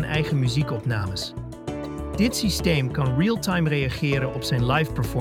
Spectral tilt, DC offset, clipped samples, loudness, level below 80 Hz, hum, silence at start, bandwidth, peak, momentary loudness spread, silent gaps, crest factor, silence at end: -5.5 dB/octave; under 0.1%; under 0.1%; -24 LUFS; -38 dBFS; none; 0 s; 16.5 kHz; -8 dBFS; 10 LU; none; 16 dB; 0 s